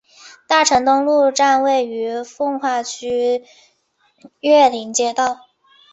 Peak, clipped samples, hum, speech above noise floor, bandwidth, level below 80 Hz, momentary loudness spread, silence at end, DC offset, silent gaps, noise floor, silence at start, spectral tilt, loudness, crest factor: -2 dBFS; under 0.1%; none; 46 dB; 8.2 kHz; -60 dBFS; 11 LU; 0.6 s; under 0.1%; none; -62 dBFS; 0.25 s; -1.5 dB/octave; -17 LUFS; 16 dB